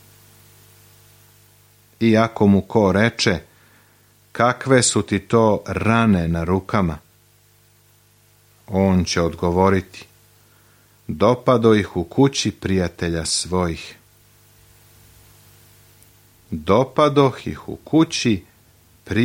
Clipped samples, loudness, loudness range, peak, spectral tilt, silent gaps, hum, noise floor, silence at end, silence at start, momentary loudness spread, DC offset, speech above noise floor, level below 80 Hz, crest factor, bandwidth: under 0.1%; -19 LUFS; 6 LU; -2 dBFS; -5.5 dB/octave; none; 50 Hz at -45 dBFS; -55 dBFS; 0 s; 2 s; 12 LU; under 0.1%; 37 dB; -44 dBFS; 18 dB; 16.5 kHz